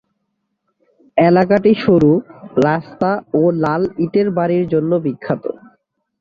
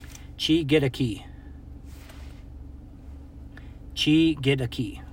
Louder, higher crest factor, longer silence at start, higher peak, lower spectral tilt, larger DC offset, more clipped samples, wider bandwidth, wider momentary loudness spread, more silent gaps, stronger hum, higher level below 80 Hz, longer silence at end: first, -16 LUFS vs -24 LUFS; about the same, 14 dB vs 18 dB; first, 1.15 s vs 0 s; first, -2 dBFS vs -8 dBFS; first, -9 dB/octave vs -6 dB/octave; neither; neither; second, 7.2 kHz vs 16 kHz; second, 10 LU vs 24 LU; neither; neither; second, -52 dBFS vs -44 dBFS; first, 0.65 s vs 0 s